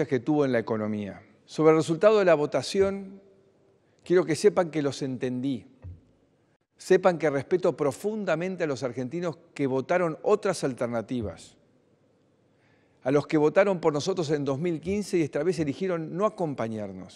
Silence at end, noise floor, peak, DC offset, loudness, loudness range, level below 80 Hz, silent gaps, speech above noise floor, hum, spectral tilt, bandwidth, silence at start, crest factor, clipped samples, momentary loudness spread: 0 s; -65 dBFS; -6 dBFS; under 0.1%; -26 LUFS; 5 LU; -64 dBFS; 6.56-6.60 s; 39 dB; none; -6 dB/octave; 12.5 kHz; 0 s; 20 dB; under 0.1%; 11 LU